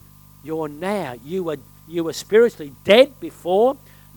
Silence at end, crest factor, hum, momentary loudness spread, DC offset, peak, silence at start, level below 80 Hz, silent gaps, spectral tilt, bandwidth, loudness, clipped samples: 0.4 s; 20 dB; 50 Hz at -50 dBFS; 16 LU; under 0.1%; 0 dBFS; 0.45 s; -56 dBFS; none; -5 dB/octave; 19 kHz; -20 LUFS; under 0.1%